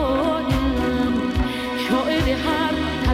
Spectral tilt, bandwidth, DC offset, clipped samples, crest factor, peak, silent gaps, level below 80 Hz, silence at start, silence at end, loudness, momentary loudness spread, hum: -6 dB/octave; 15.5 kHz; under 0.1%; under 0.1%; 14 dB; -8 dBFS; none; -30 dBFS; 0 s; 0 s; -21 LUFS; 3 LU; none